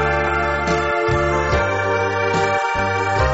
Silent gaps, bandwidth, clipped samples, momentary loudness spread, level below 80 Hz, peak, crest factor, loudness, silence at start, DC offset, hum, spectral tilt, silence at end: none; 8 kHz; under 0.1%; 1 LU; -32 dBFS; -6 dBFS; 12 dB; -18 LUFS; 0 s; 0.1%; none; -4 dB/octave; 0 s